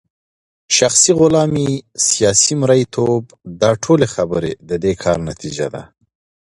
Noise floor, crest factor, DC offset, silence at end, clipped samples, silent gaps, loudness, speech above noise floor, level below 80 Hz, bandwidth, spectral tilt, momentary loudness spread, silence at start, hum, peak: under -90 dBFS; 16 dB; under 0.1%; 0.6 s; under 0.1%; none; -15 LUFS; over 75 dB; -44 dBFS; 11.5 kHz; -4 dB/octave; 12 LU; 0.7 s; none; 0 dBFS